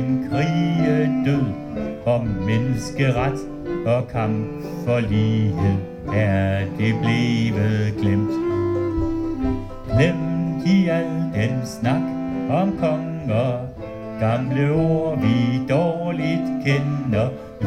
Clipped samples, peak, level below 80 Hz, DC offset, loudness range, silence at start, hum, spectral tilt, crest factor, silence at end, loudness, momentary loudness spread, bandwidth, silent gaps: under 0.1%; -4 dBFS; -40 dBFS; under 0.1%; 2 LU; 0 s; none; -8 dB/octave; 16 dB; 0 s; -21 LUFS; 7 LU; 10.5 kHz; none